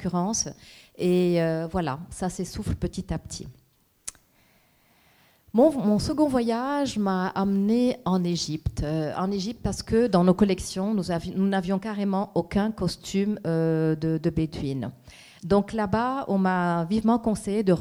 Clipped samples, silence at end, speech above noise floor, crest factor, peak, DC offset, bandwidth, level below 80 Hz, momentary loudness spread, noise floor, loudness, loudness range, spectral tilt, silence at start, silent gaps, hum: under 0.1%; 0 s; 37 dB; 18 dB; -8 dBFS; under 0.1%; 15 kHz; -46 dBFS; 10 LU; -62 dBFS; -25 LUFS; 5 LU; -6 dB/octave; 0 s; none; none